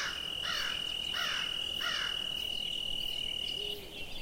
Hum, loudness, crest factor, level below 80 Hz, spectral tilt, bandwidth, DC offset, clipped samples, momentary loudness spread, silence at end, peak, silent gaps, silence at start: none; -33 LUFS; 14 dB; -54 dBFS; -0.5 dB/octave; 16 kHz; under 0.1%; under 0.1%; 3 LU; 0 s; -22 dBFS; none; 0 s